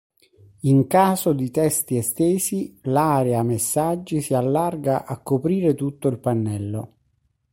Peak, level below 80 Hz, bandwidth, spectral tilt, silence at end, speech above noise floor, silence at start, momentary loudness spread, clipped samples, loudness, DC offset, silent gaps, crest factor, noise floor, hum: -4 dBFS; -58 dBFS; 16.5 kHz; -6 dB/octave; 0.65 s; 47 dB; 0.65 s; 8 LU; under 0.1%; -21 LUFS; under 0.1%; none; 16 dB; -68 dBFS; none